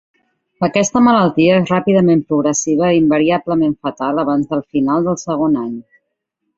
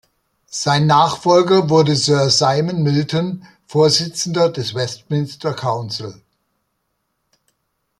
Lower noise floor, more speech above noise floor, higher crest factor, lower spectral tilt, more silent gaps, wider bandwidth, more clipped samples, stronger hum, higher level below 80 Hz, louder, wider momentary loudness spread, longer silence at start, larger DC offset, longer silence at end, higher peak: about the same, -73 dBFS vs -71 dBFS; first, 59 dB vs 55 dB; about the same, 14 dB vs 18 dB; about the same, -5.5 dB/octave vs -5 dB/octave; neither; second, 8 kHz vs 12.5 kHz; neither; neither; first, -52 dBFS vs -58 dBFS; about the same, -15 LUFS vs -16 LUFS; second, 7 LU vs 11 LU; about the same, 0.6 s vs 0.5 s; neither; second, 0.75 s vs 1.85 s; about the same, -2 dBFS vs 0 dBFS